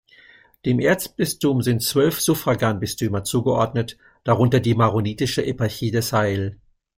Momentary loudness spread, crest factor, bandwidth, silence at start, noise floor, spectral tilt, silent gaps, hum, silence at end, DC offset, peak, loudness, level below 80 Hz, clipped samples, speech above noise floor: 6 LU; 18 dB; 16.5 kHz; 0.65 s; -51 dBFS; -5.5 dB/octave; none; none; 0.45 s; under 0.1%; -4 dBFS; -21 LUFS; -50 dBFS; under 0.1%; 31 dB